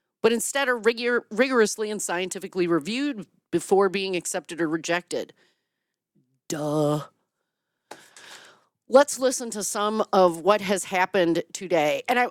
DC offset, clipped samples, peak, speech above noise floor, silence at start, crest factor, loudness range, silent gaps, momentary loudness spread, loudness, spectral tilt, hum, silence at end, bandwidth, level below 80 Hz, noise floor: under 0.1%; under 0.1%; -4 dBFS; 59 dB; 0.25 s; 20 dB; 9 LU; none; 10 LU; -24 LUFS; -3.5 dB/octave; none; 0 s; 17 kHz; -72 dBFS; -83 dBFS